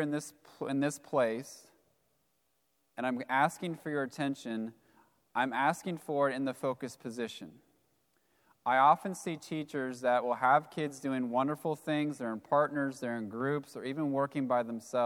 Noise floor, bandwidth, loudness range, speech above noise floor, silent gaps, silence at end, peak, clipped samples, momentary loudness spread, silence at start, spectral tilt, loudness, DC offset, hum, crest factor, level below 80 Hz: -78 dBFS; 17.5 kHz; 5 LU; 45 dB; none; 0 s; -12 dBFS; under 0.1%; 12 LU; 0 s; -5.5 dB/octave; -33 LUFS; under 0.1%; none; 20 dB; -84 dBFS